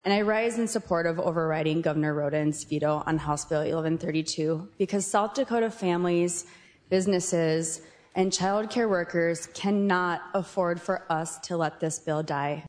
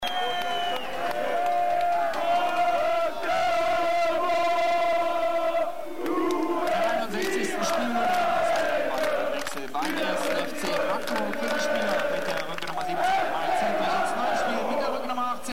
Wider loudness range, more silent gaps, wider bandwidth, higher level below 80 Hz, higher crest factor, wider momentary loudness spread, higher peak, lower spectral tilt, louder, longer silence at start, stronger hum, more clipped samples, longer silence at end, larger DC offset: about the same, 1 LU vs 3 LU; neither; second, 11 kHz vs 16 kHz; about the same, -60 dBFS vs -58 dBFS; first, 18 dB vs 10 dB; about the same, 5 LU vs 5 LU; first, -10 dBFS vs -16 dBFS; first, -5 dB/octave vs -3 dB/octave; about the same, -27 LUFS vs -26 LUFS; about the same, 0.05 s vs 0 s; neither; neither; about the same, 0 s vs 0 s; second, under 0.1% vs 2%